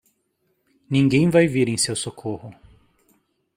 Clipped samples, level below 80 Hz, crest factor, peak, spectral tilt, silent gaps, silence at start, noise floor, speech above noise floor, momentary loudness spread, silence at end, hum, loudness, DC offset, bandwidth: under 0.1%; -56 dBFS; 18 dB; -4 dBFS; -5 dB/octave; none; 0.9 s; -70 dBFS; 50 dB; 15 LU; 1.05 s; none; -20 LUFS; under 0.1%; 16 kHz